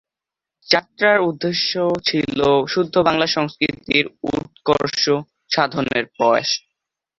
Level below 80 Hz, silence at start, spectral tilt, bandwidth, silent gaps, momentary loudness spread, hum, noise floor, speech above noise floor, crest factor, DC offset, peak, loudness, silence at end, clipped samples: -54 dBFS; 0.7 s; -4 dB/octave; 7.6 kHz; none; 6 LU; none; -87 dBFS; 68 dB; 20 dB; under 0.1%; 0 dBFS; -19 LUFS; 0.6 s; under 0.1%